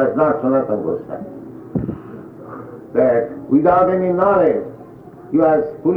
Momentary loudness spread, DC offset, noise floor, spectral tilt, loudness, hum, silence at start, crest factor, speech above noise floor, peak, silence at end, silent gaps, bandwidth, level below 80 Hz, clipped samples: 20 LU; under 0.1%; -38 dBFS; -10.5 dB/octave; -17 LUFS; none; 0 s; 14 dB; 22 dB; -4 dBFS; 0 s; none; 4.6 kHz; -50 dBFS; under 0.1%